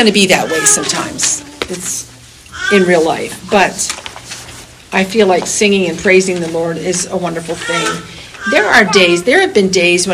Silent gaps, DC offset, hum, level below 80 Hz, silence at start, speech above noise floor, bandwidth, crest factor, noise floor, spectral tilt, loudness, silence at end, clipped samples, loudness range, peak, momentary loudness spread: none; under 0.1%; none; -46 dBFS; 0 s; 22 dB; over 20 kHz; 14 dB; -34 dBFS; -3 dB/octave; -12 LUFS; 0 s; 0.2%; 3 LU; 0 dBFS; 15 LU